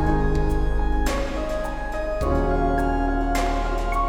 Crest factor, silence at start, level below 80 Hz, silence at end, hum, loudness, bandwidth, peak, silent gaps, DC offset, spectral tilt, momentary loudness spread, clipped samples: 12 dB; 0 s; -24 dBFS; 0 s; none; -24 LUFS; 15 kHz; -10 dBFS; none; under 0.1%; -6.5 dB/octave; 6 LU; under 0.1%